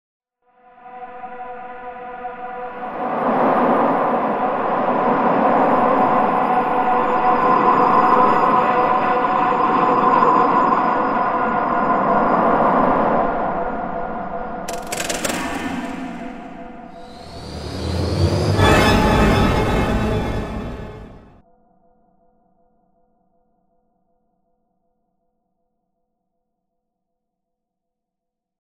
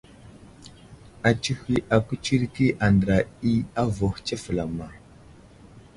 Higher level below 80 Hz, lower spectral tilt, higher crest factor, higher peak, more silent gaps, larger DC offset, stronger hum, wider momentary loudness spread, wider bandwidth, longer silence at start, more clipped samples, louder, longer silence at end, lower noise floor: first, -34 dBFS vs -44 dBFS; about the same, -6 dB/octave vs -6.5 dB/octave; about the same, 18 dB vs 20 dB; about the same, -2 dBFS vs -4 dBFS; neither; neither; neither; first, 19 LU vs 8 LU; first, 16 kHz vs 11.5 kHz; first, 0.85 s vs 0.25 s; neither; first, -17 LUFS vs -24 LUFS; first, 7.45 s vs 0.15 s; first, -82 dBFS vs -49 dBFS